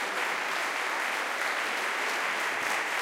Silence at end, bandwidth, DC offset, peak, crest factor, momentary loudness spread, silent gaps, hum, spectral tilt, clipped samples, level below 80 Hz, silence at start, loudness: 0 s; 17 kHz; under 0.1%; -16 dBFS; 14 dB; 1 LU; none; none; 0 dB/octave; under 0.1%; -86 dBFS; 0 s; -29 LUFS